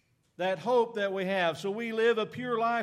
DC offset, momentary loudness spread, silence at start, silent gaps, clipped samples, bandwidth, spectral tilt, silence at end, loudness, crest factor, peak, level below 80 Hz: under 0.1%; 6 LU; 0.4 s; none; under 0.1%; 13 kHz; -5 dB/octave; 0 s; -29 LUFS; 14 dB; -16 dBFS; -80 dBFS